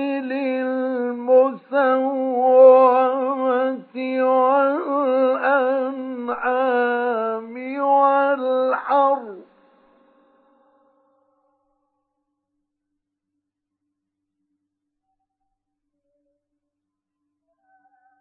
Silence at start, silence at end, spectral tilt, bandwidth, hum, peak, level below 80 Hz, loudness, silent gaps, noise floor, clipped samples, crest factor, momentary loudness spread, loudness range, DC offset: 0 s; 8.8 s; -8.5 dB/octave; 4.4 kHz; none; -2 dBFS; -78 dBFS; -19 LUFS; none; -82 dBFS; under 0.1%; 20 dB; 11 LU; 7 LU; under 0.1%